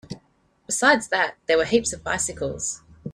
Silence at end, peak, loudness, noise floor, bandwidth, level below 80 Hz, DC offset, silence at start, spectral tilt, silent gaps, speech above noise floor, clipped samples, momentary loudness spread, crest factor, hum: 0 s; -4 dBFS; -22 LUFS; -63 dBFS; 14.5 kHz; -52 dBFS; under 0.1%; 0.1 s; -2.5 dB/octave; none; 40 dB; under 0.1%; 14 LU; 20 dB; none